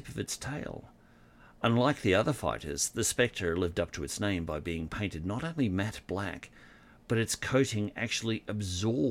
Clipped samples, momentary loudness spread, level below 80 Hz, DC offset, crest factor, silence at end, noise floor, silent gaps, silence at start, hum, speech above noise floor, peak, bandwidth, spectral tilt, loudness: under 0.1%; 9 LU; -54 dBFS; under 0.1%; 20 dB; 0 s; -58 dBFS; none; 0 s; none; 27 dB; -12 dBFS; 16.5 kHz; -4.5 dB/octave; -32 LUFS